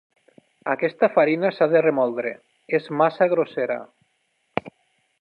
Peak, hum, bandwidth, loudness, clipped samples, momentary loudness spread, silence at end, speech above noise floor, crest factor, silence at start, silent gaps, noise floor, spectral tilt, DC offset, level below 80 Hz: -2 dBFS; none; 5.4 kHz; -22 LUFS; under 0.1%; 13 LU; 0.5 s; 49 dB; 20 dB; 0.65 s; none; -70 dBFS; -8.5 dB/octave; under 0.1%; -70 dBFS